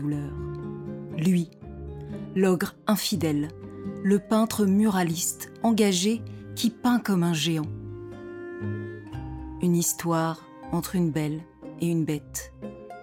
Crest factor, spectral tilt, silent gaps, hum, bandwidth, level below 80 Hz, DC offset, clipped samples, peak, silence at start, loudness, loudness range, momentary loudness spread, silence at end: 16 dB; -5 dB/octave; none; none; 18 kHz; -52 dBFS; under 0.1%; under 0.1%; -10 dBFS; 0 s; -26 LUFS; 4 LU; 15 LU; 0 s